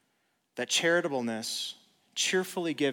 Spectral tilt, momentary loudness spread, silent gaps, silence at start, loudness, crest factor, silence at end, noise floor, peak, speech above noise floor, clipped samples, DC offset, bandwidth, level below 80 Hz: -2.5 dB/octave; 13 LU; none; 0.55 s; -30 LUFS; 18 dB; 0 s; -75 dBFS; -14 dBFS; 46 dB; under 0.1%; under 0.1%; 19 kHz; -88 dBFS